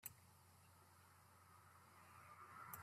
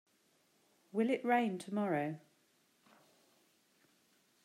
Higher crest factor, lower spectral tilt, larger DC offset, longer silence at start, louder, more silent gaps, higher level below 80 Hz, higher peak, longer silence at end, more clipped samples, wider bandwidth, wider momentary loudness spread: first, 28 dB vs 20 dB; second, -3 dB/octave vs -6.5 dB/octave; neither; second, 0 s vs 0.95 s; second, -64 LUFS vs -36 LUFS; neither; about the same, -90 dBFS vs under -90 dBFS; second, -34 dBFS vs -20 dBFS; second, 0 s vs 2.25 s; neither; first, 15.5 kHz vs 14 kHz; about the same, 11 LU vs 10 LU